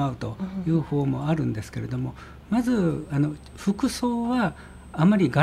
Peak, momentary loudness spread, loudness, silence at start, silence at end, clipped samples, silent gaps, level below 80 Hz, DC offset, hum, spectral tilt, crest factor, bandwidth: -6 dBFS; 10 LU; -26 LUFS; 0 s; 0 s; under 0.1%; none; -48 dBFS; under 0.1%; none; -7 dB/octave; 20 dB; 15 kHz